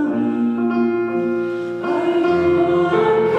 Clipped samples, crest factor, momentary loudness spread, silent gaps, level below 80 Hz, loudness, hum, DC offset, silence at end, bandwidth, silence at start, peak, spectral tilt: under 0.1%; 12 dB; 6 LU; none; -58 dBFS; -18 LUFS; none; under 0.1%; 0 s; 6.2 kHz; 0 s; -6 dBFS; -8 dB/octave